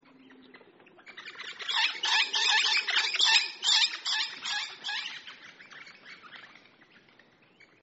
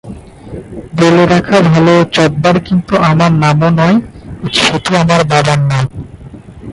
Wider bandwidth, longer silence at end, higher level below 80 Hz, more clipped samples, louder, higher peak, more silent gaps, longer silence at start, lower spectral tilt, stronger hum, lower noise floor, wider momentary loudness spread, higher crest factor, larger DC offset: second, 8 kHz vs 11.5 kHz; first, 1.35 s vs 0 s; second, under -90 dBFS vs -36 dBFS; neither; second, -25 LUFS vs -10 LUFS; second, -8 dBFS vs 0 dBFS; neither; first, 0.3 s vs 0.05 s; second, 5.5 dB/octave vs -6 dB/octave; neither; first, -61 dBFS vs -31 dBFS; first, 25 LU vs 21 LU; first, 22 dB vs 10 dB; neither